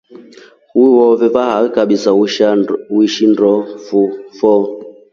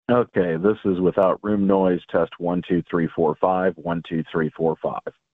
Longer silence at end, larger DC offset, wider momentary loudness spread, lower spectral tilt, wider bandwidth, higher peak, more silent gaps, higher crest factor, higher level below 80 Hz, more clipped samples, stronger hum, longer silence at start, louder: about the same, 0.2 s vs 0.25 s; neither; about the same, 8 LU vs 7 LU; second, -5.5 dB/octave vs -10.5 dB/octave; first, 7.4 kHz vs 4.2 kHz; first, 0 dBFS vs -4 dBFS; neither; about the same, 12 dB vs 16 dB; about the same, -58 dBFS vs -54 dBFS; neither; neither; about the same, 0.1 s vs 0.1 s; first, -12 LUFS vs -22 LUFS